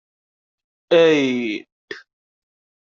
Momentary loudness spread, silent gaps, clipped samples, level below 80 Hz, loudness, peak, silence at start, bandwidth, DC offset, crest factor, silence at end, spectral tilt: 23 LU; 1.72-1.88 s; under 0.1%; -70 dBFS; -17 LUFS; -4 dBFS; 0.9 s; 7.4 kHz; under 0.1%; 18 dB; 0.9 s; -5 dB/octave